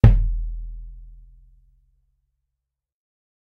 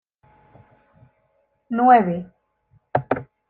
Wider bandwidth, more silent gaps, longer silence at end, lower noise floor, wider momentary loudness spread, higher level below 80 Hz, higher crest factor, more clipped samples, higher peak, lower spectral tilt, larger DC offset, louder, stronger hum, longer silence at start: about the same, 4.1 kHz vs 4.3 kHz; neither; first, 2.4 s vs 0.25 s; first, -82 dBFS vs -67 dBFS; first, 25 LU vs 15 LU; first, -26 dBFS vs -62 dBFS; about the same, 22 dB vs 20 dB; neither; about the same, 0 dBFS vs -2 dBFS; about the same, -10 dB/octave vs -10 dB/octave; neither; second, -24 LUFS vs -20 LUFS; neither; second, 0.05 s vs 1.7 s